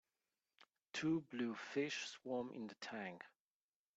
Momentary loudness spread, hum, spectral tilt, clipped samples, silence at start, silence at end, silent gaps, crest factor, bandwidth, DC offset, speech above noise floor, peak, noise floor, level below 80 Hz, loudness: 10 LU; none; -4.5 dB/octave; under 0.1%; 0.6 s; 0.7 s; none; 18 dB; 8.2 kHz; under 0.1%; over 46 dB; -28 dBFS; under -90 dBFS; -86 dBFS; -45 LUFS